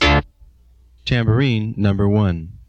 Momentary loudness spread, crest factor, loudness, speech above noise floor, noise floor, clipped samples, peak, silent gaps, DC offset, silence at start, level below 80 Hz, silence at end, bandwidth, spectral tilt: 5 LU; 14 dB; -18 LUFS; 33 dB; -50 dBFS; under 0.1%; -4 dBFS; none; under 0.1%; 0 s; -30 dBFS; 0.1 s; 7.8 kHz; -7 dB/octave